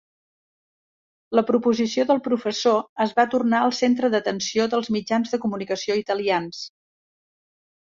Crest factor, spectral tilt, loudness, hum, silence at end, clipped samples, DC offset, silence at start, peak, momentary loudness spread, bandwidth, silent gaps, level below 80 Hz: 18 dB; -4.5 dB/octave; -22 LUFS; none; 1.25 s; under 0.1%; under 0.1%; 1.3 s; -6 dBFS; 6 LU; 7.6 kHz; 2.89-2.96 s; -68 dBFS